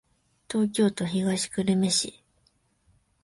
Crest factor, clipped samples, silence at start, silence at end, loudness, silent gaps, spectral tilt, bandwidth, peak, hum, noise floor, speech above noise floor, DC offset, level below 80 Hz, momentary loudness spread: 18 dB; under 0.1%; 0.5 s; 1.15 s; -26 LUFS; none; -4.5 dB/octave; 11.5 kHz; -12 dBFS; none; -68 dBFS; 43 dB; under 0.1%; -64 dBFS; 6 LU